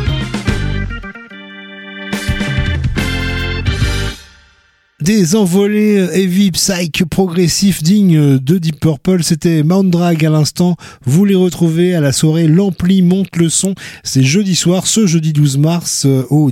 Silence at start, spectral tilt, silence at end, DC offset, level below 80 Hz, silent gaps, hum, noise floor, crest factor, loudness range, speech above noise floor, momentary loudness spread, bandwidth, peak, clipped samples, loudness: 0 s; -5.5 dB/octave; 0 s; under 0.1%; -28 dBFS; none; none; -52 dBFS; 12 dB; 7 LU; 41 dB; 9 LU; 16.5 kHz; -2 dBFS; under 0.1%; -13 LUFS